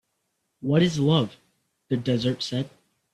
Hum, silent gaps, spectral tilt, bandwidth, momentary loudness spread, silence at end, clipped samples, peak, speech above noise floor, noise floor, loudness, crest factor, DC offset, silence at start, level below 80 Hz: none; none; -6.5 dB/octave; 11.5 kHz; 12 LU; 0.45 s; under 0.1%; -8 dBFS; 53 dB; -76 dBFS; -25 LUFS; 18 dB; under 0.1%; 0.6 s; -60 dBFS